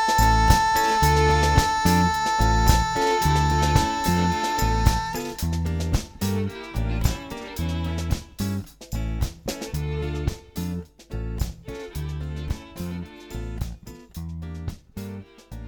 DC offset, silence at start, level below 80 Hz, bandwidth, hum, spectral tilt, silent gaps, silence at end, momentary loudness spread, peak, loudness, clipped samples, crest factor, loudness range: under 0.1%; 0 s; -28 dBFS; over 20 kHz; none; -5 dB/octave; none; 0 s; 17 LU; -2 dBFS; -24 LUFS; under 0.1%; 22 dB; 14 LU